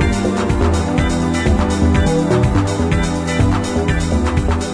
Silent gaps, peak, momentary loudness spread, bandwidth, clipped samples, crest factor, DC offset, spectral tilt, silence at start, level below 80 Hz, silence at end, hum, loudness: none; -2 dBFS; 3 LU; 10.5 kHz; under 0.1%; 12 dB; under 0.1%; -6.5 dB/octave; 0 s; -22 dBFS; 0 s; none; -16 LUFS